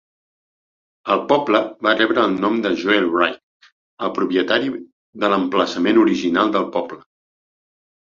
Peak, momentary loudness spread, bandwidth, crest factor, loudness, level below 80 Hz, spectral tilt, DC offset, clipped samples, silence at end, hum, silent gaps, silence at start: 0 dBFS; 10 LU; 7.4 kHz; 18 dB; -18 LUFS; -62 dBFS; -5.5 dB/octave; under 0.1%; under 0.1%; 1.2 s; none; 3.43-3.60 s, 3.72-3.97 s, 4.92-5.13 s; 1.05 s